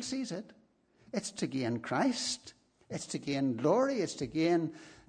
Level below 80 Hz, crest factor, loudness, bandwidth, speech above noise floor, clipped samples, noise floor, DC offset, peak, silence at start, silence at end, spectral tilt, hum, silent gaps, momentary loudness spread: -70 dBFS; 18 dB; -33 LUFS; 10 kHz; 32 dB; under 0.1%; -65 dBFS; under 0.1%; -16 dBFS; 0 s; 0.15 s; -4.5 dB/octave; none; none; 11 LU